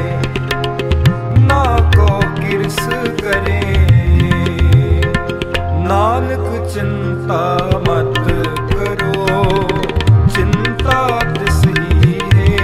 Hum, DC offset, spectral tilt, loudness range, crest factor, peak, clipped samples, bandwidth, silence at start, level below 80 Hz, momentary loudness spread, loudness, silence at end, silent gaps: none; under 0.1%; -6.5 dB/octave; 3 LU; 12 dB; 0 dBFS; under 0.1%; 15 kHz; 0 s; -20 dBFS; 7 LU; -14 LUFS; 0 s; none